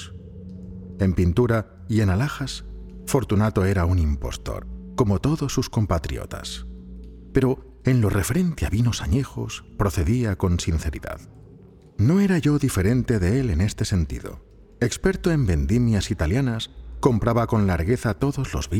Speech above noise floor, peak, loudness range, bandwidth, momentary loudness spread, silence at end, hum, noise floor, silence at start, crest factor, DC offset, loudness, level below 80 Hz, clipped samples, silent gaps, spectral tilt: 26 dB; -4 dBFS; 3 LU; 16.5 kHz; 15 LU; 0 s; none; -47 dBFS; 0 s; 20 dB; under 0.1%; -23 LUFS; -36 dBFS; under 0.1%; none; -6.5 dB/octave